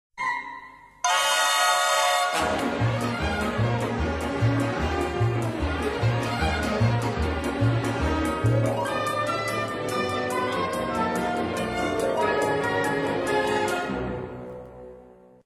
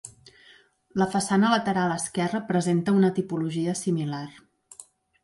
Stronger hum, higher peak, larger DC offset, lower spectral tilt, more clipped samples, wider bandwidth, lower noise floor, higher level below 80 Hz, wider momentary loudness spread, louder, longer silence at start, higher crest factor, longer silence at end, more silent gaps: neither; about the same, -8 dBFS vs -10 dBFS; neither; about the same, -4.5 dB/octave vs -5.5 dB/octave; neither; first, 13 kHz vs 11.5 kHz; second, -50 dBFS vs -57 dBFS; first, -40 dBFS vs -66 dBFS; second, 8 LU vs 21 LU; about the same, -25 LUFS vs -25 LUFS; about the same, 0.15 s vs 0.05 s; about the same, 16 dB vs 16 dB; about the same, 0.35 s vs 0.4 s; neither